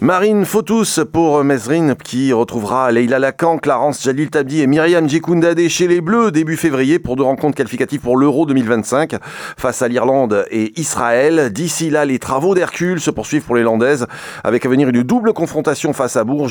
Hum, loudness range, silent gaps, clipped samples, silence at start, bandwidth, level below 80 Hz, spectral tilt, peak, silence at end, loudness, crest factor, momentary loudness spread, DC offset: none; 2 LU; none; under 0.1%; 0 s; 19 kHz; -50 dBFS; -5.5 dB/octave; -2 dBFS; 0 s; -15 LUFS; 14 dB; 5 LU; under 0.1%